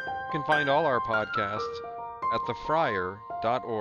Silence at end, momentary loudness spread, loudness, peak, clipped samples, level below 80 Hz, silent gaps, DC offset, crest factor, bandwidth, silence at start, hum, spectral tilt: 0 s; 10 LU; -28 LUFS; -10 dBFS; under 0.1%; -58 dBFS; none; under 0.1%; 18 dB; 11 kHz; 0 s; none; -6 dB/octave